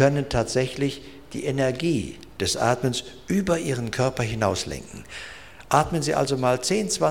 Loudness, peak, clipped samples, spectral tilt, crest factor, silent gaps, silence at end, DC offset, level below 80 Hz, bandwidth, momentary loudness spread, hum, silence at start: -24 LUFS; -4 dBFS; under 0.1%; -5 dB/octave; 20 dB; none; 0 s; 0.3%; -46 dBFS; 17 kHz; 15 LU; none; 0 s